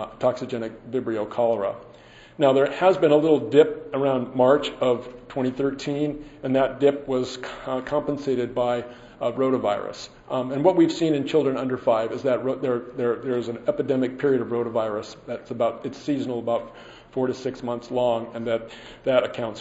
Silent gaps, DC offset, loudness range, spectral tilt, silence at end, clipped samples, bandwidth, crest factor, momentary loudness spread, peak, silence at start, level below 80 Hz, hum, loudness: none; under 0.1%; 6 LU; -6.5 dB/octave; 0 s; under 0.1%; 8 kHz; 20 dB; 12 LU; -4 dBFS; 0 s; -58 dBFS; none; -24 LUFS